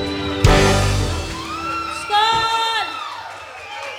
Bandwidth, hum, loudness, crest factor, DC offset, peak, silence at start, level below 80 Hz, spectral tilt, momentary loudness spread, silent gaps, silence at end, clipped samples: 16.5 kHz; none; -18 LUFS; 20 dB; under 0.1%; 0 dBFS; 0 s; -28 dBFS; -4.5 dB/octave; 16 LU; none; 0 s; under 0.1%